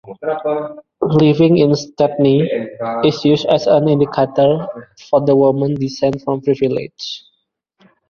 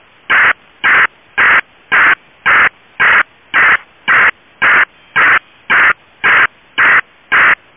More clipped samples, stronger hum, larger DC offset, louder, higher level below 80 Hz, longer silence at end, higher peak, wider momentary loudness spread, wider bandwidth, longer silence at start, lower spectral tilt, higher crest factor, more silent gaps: neither; neither; neither; second, -15 LUFS vs -10 LUFS; about the same, -52 dBFS vs -50 dBFS; first, 0.9 s vs 0.25 s; about the same, 0 dBFS vs 0 dBFS; first, 11 LU vs 5 LU; first, 7.2 kHz vs 3.8 kHz; second, 0.05 s vs 0.3 s; first, -7.5 dB/octave vs -4.5 dB/octave; about the same, 14 dB vs 10 dB; neither